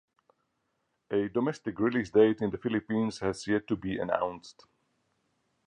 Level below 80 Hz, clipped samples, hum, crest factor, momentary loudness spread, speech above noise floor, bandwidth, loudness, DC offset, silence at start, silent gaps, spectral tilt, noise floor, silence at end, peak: -62 dBFS; under 0.1%; none; 22 dB; 9 LU; 49 dB; 10 kHz; -30 LUFS; under 0.1%; 1.1 s; none; -6.5 dB/octave; -78 dBFS; 1.15 s; -10 dBFS